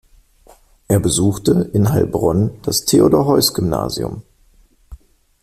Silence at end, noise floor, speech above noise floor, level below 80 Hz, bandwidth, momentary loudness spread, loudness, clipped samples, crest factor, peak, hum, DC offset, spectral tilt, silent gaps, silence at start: 0.5 s; -52 dBFS; 37 dB; -40 dBFS; 16 kHz; 9 LU; -16 LUFS; under 0.1%; 16 dB; -2 dBFS; none; under 0.1%; -5.5 dB/octave; none; 0.9 s